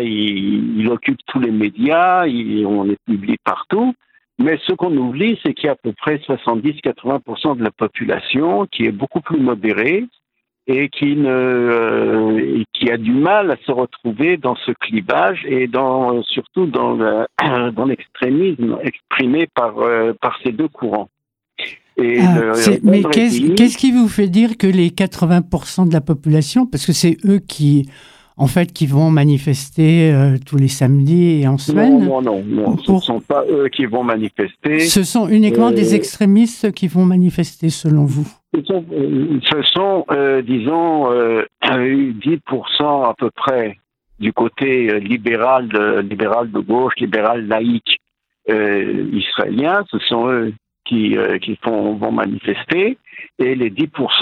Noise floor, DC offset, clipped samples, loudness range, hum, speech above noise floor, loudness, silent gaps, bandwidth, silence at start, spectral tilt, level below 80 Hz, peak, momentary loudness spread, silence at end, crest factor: -55 dBFS; under 0.1%; under 0.1%; 5 LU; none; 40 dB; -16 LUFS; none; 15.5 kHz; 0 s; -6 dB/octave; -52 dBFS; 0 dBFS; 8 LU; 0 s; 16 dB